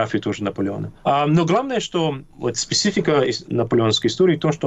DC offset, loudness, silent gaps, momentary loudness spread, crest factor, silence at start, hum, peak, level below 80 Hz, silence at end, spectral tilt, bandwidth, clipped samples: under 0.1%; -20 LUFS; none; 8 LU; 12 dB; 0 s; none; -8 dBFS; -52 dBFS; 0 s; -5 dB/octave; 8.4 kHz; under 0.1%